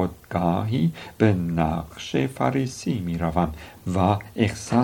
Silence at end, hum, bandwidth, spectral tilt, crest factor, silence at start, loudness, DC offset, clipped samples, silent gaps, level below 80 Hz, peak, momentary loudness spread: 0 s; none; 18 kHz; -7 dB/octave; 20 dB; 0 s; -24 LUFS; under 0.1%; under 0.1%; none; -46 dBFS; -4 dBFS; 6 LU